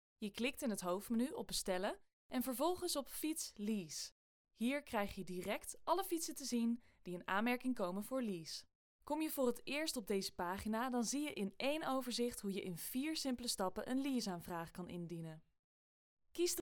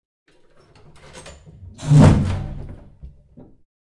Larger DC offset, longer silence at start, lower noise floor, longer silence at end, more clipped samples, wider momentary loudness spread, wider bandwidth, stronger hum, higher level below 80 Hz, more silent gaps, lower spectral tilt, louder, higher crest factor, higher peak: neither; second, 0.2 s vs 1.15 s; first, under -90 dBFS vs -52 dBFS; second, 0 s vs 0.85 s; neither; second, 9 LU vs 28 LU; first, over 20 kHz vs 11 kHz; neither; second, -68 dBFS vs -34 dBFS; first, 2.13-2.29 s, 4.12-4.45 s, 8.75-8.99 s, 15.59-16.17 s vs none; second, -3.5 dB/octave vs -8 dB/octave; second, -42 LUFS vs -15 LUFS; about the same, 18 dB vs 20 dB; second, -24 dBFS vs -2 dBFS